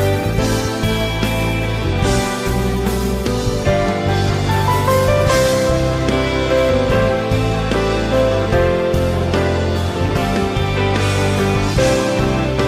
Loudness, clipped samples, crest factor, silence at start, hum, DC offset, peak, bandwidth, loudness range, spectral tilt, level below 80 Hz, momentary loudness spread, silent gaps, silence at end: -17 LUFS; under 0.1%; 12 dB; 0 s; none; under 0.1%; -2 dBFS; 16 kHz; 3 LU; -5.5 dB/octave; -26 dBFS; 4 LU; none; 0 s